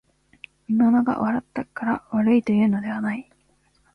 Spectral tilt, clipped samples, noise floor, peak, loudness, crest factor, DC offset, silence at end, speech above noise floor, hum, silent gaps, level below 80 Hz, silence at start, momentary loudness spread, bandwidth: -8.5 dB/octave; under 0.1%; -63 dBFS; -8 dBFS; -22 LUFS; 14 dB; under 0.1%; 0.75 s; 42 dB; none; none; -60 dBFS; 0.7 s; 11 LU; 5.8 kHz